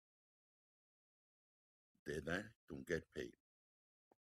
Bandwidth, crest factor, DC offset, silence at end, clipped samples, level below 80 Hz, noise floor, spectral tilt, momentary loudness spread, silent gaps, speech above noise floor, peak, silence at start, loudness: 14 kHz; 24 dB; under 0.1%; 1 s; under 0.1%; -74 dBFS; under -90 dBFS; -5.5 dB/octave; 11 LU; 2.55-2.68 s; over 43 dB; -28 dBFS; 2.05 s; -48 LUFS